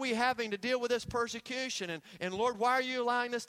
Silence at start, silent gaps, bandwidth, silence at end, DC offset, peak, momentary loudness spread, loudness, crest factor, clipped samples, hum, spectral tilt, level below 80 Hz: 0 s; none; 15.5 kHz; 0.05 s; under 0.1%; -16 dBFS; 8 LU; -33 LUFS; 18 dB; under 0.1%; none; -3 dB/octave; -66 dBFS